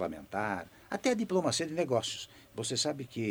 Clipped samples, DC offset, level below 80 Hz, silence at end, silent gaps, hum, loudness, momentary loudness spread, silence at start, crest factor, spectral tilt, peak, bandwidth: under 0.1%; under 0.1%; -66 dBFS; 0 s; none; none; -33 LUFS; 10 LU; 0 s; 18 dB; -4 dB/octave; -16 dBFS; over 20 kHz